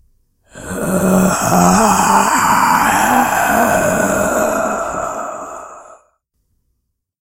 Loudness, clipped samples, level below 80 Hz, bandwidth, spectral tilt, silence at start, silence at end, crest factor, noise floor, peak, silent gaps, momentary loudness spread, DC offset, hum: -13 LUFS; under 0.1%; -40 dBFS; 16 kHz; -4 dB/octave; 0.55 s; 1.4 s; 16 dB; -70 dBFS; 0 dBFS; none; 14 LU; under 0.1%; none